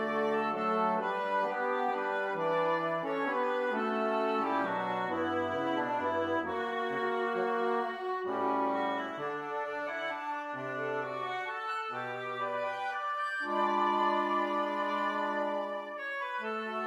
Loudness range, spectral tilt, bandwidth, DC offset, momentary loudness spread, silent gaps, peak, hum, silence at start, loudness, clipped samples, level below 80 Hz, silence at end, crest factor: 4 LU; -5.5 dB/octave; 13.5 kHz; under 0.1%; 6 LU; none; -16 dBFS; none; 0 s; -32 LUFS; under 0.1%; -80 dBFS; 0 s; 16 dB